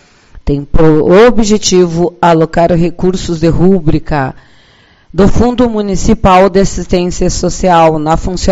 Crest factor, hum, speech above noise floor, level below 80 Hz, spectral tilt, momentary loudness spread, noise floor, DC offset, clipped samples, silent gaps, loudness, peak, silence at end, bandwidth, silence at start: 8 dB; none; 36 dB; -22 dBFS; -6 dB/octave; 8 LU; -45 dBFS; under 0.1%; 1%; none; -10 LUFS; 0 dBFS; 0 s; 8 kHz; 0.35 s